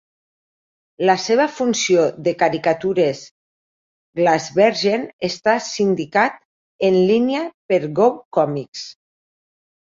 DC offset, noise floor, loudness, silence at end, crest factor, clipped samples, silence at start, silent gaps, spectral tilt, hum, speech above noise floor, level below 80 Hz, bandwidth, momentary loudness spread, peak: under 0.1%; under -90 dBFS; -18 LUFS; 0.9 s; 18 dB; under 0.1%; 1 s; 3.31-4.13 s, 5.13-5.19 s, 6.45-6.79 s, 7.54-7.69 s, 8.25-8.31 s, 8.68-8.73 s; -4.5 dB/octave; none; over 72 dB; -64 dBFS; 7.6 kHz; 9 LU; -2 dBFS